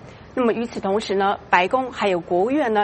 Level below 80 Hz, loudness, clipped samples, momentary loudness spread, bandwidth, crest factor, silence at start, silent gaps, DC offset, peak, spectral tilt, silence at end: -54 dBFS; -21 LUFS; under 0.1%; 5 LU; 8.8 kHz; 20 dB; 0 s; none; under 0.1%; 0 dBFS; -5.5 dB/octave; 0 s